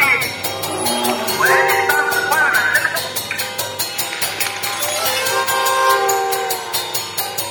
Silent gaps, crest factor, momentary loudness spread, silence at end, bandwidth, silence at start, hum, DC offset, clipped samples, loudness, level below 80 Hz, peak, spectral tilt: none; 16 dB; 7 LU; 0 s; 19 kHz; 0 s; none; under 0.1%; under 0.1%; -17 LUFS; -56 dBFS; -2 dBFS; -1 dB/octave